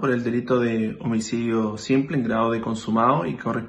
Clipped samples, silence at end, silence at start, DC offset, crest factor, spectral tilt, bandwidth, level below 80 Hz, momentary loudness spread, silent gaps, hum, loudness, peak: under 0.1%; 0 s; 0 s; under 0.1%; 16 dB; -6.5 dB/octave; 9.2 kHz; -56 dBFS; 5 LU; none; none; -23 LUFS; -6 dBFS